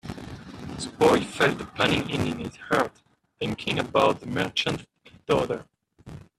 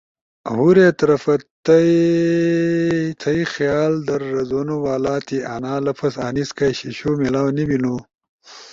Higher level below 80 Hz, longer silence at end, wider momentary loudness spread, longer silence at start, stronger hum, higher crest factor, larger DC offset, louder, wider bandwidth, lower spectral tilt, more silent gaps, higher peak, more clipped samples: about the same, -54 dBFS vs -52 dBFS; first, 0.15 s vs 0 s; first, 18 LU vs 10 LU; second, 0.05 s vs 0.45 s; neither; about the same, 20 dB vs 16 dB; neither; second, -25 LUFS vs -18 LUFS; first, 14 kHz vs 7.6 kHz; second, -5 dB/octave vs -7 dB/octave; second, none vs 1.51-1.63 s, 8.29-8.39 s; second, -6 dBFS vs -2 dBFS; neither